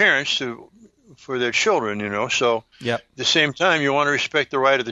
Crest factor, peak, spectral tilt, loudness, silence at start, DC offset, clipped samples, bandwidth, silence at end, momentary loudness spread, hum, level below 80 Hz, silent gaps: 18 dB; -2 dBFS; -3 dB/octave; -20 LUFS; 0 s; under 0.1%; under 0.1%; 10 kHz; 0 s; 9 LU; none; -62 dBFS; none